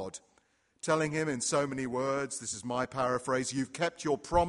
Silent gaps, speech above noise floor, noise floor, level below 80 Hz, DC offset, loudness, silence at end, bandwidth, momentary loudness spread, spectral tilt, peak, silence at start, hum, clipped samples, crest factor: none; 39 dB; -70 dBFS; -54 dBFS; under 0.1%; -32 LUFS; 0 s; 11.5 kHz; 6 LU; -4 dB/octave; -12 dBFS; 0 s; none; under 0.1%; 20 dB